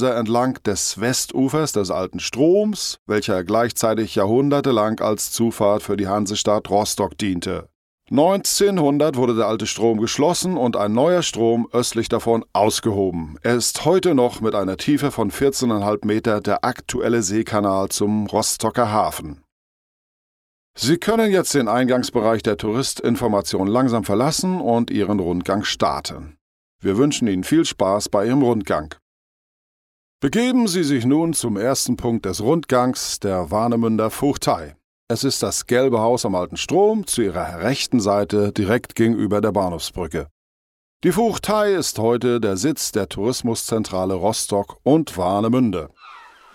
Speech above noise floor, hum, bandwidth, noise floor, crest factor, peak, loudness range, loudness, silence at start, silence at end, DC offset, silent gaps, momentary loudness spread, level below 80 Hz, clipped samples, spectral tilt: 24 dB; none; 16.5 kHz; -43 dBFS; 18 dB; -2 dBFS; 2 LU; -20 LUFS; 0 s; 0.3 s; under 0.1%; 2.99-3.06 s, 7.75-7.98 s, 19.52-20.74 s, 26.41-26.79 s, 29.02-30.19 s, 34.84-35.07 s, 40.31-41.00 s; 6 LU; -48 dBFS; under 0.1%; -4.5 dB/octave